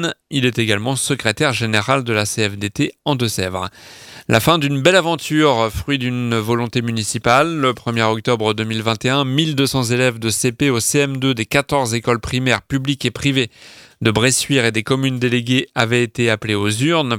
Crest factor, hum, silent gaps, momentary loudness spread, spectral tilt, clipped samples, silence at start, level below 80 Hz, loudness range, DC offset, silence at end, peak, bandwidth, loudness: 18 dB; none; none; 6 LU; -4.5 dB/octave; under 0.1%; 0 s; -46 dBFS; 2 LU; under 0.1%; 0 s; 0 dBFS; 17 kHz; -17 LUFS